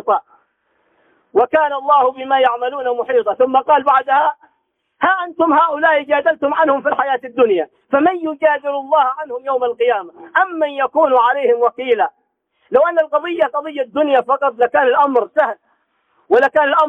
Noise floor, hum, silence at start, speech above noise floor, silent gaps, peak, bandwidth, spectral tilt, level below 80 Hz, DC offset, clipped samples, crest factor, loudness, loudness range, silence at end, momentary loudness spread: -67 dBFS; none; 0.05 s; 52 dB; none; -2 dBFS; 4 kHz; -5.5 dB/octave; -66 dBFS; under 0.1%; under 0.1%; 14 dB; -16 LUFS; 2 LU; 0 s; 7 LU